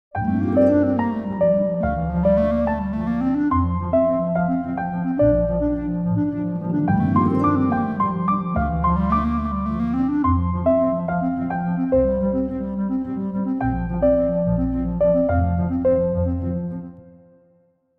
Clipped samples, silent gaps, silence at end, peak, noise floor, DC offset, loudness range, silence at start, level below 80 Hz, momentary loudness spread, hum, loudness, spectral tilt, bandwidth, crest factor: under 0.1%; none; 0.9 s; -6 dBFS; -60 dBFS; under 0.1%; 2 LU; 0.15 s; -34 dBFS; 6 LU; none; -21 LUFS; -11.5 dB/octave; 4.2 kHz; 14 dB